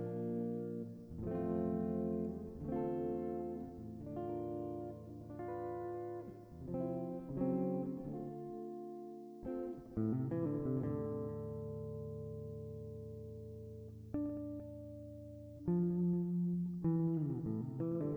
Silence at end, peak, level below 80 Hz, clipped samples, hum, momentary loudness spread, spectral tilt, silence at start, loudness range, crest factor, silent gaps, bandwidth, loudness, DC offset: 0 s; -26 dBFS; -62 dBFS; under 0.1%; none; 13 LU; -11.5 dB/octave; 0 s; 8 LU; 16 dB; none; 2.8 kHz; -41 LUFS; under 0.1%